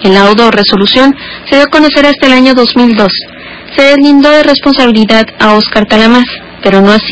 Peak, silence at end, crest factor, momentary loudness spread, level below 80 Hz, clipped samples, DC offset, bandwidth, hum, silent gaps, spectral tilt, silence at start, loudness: 0 dBFS; 0 s; 6 dB; 7 LU; -36 dBFS; 9%; under 0.1%; 8 kHz; none; none; -5.5 dB/octave; 0 s; -5 LUFS